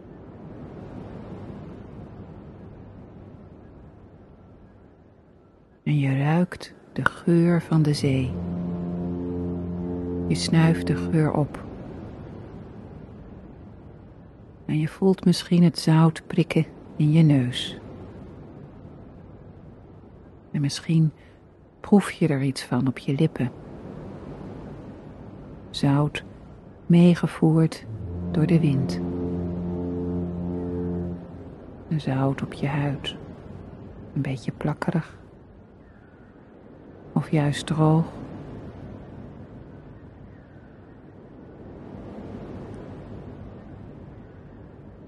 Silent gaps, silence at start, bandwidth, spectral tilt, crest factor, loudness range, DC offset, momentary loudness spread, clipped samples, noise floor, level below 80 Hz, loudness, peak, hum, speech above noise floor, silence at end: none; 0 s; 12 kHz; -7 dB/octave; 24 dB; 19 LU; under 0.1%; 25 LU; under 0.1%; -54 dBFS; -50 dBFS; -24 LUFS; -2 dBFS; none; 33 dB; 0 s